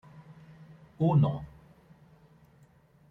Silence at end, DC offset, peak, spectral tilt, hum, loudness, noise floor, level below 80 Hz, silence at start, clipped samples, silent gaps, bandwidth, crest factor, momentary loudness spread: 1.65 s; under 0.1%; -14 dBFS; -11 dB/octave; none; -28 LUFS; -61 dBFS; -62 dBFS; 1 s; under 0.1%; none; 4 kHz; 18 dB; 28 LU